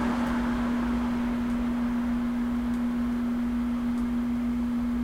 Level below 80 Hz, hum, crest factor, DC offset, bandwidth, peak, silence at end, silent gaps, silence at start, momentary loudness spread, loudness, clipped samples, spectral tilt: -40 dBFS; none; 12 dB; under 0.1%; 11 kHz; -16 dBFS; 0 s; none; 0 s; 1 LU; -28 LUFS; under 0.1%; -7 dB/octave